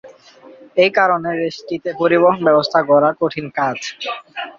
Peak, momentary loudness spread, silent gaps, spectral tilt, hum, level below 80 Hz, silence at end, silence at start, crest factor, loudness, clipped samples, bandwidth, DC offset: -2 dBFS; 12 LU; none; -5.5 dB/octave; none; -62 dBFS; 0.1 s; 0.05 s; 16 dB; -16 LUFS; under 0.1%; 7.4 kHz; under 0.1%